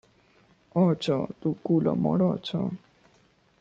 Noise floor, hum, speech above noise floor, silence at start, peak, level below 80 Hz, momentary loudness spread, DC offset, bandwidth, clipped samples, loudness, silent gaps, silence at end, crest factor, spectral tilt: -63 dBFS; none; 38 dB; 0.75 s; -12 dBFS; -64 dBFS; 8 LU; under 0.1%; 7.8 kHz; under 0.1%; -27 LUFS; none; 0.85 s; 16 dB; -8.5 dB/octave